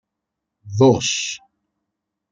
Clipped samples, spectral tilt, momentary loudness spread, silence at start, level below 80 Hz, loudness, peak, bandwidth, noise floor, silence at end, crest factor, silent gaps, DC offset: under 0.1%; -4.5 dB/octave; 16 LU; 0.65 s; -58 dBFS; -18 LUFS; -2 dBFS; 9.4 kHz; -81 dBFS; 0.95 s; 20 dB; none; under 0.1%